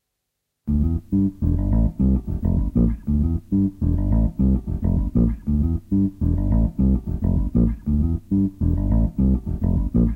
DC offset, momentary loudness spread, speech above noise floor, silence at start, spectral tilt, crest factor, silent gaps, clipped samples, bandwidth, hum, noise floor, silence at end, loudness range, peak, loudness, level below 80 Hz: under 0.1%; 3 LU; 59 dB; 0.65 s; -12 dB/octave; 14 dB; none; under 0.1%; 2.2 kHz; none; -78 dBFS; 0 s; 1 LU; -6 dBFS; -22 LUFS; -24 dBFS